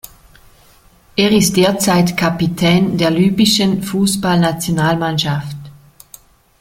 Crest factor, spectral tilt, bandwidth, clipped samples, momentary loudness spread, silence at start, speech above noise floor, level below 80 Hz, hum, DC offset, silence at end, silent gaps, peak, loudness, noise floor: 14 dB; -5 dB/octave; 17 kHz; under 0.1%; 7 LU; 1.15 s; 34 dB; -44 dBFS; none; under 0.1%; 0.9 s; none; 0 dBFS; -14 LUFS; -48 dBFS